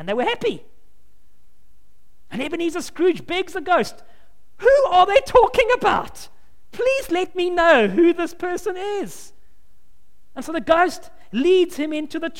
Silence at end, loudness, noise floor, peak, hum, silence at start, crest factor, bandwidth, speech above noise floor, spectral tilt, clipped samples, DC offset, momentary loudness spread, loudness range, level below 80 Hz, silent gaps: 0 s; -19 LUFS; -59 dBFS; -2 dBFS; none; 0 s; 20 dB; 16.5 kHz; 40 dB; -4.5 dB/octave; under 0.1%; 2%; 15 LU; 7 LU; -46 dBFS; none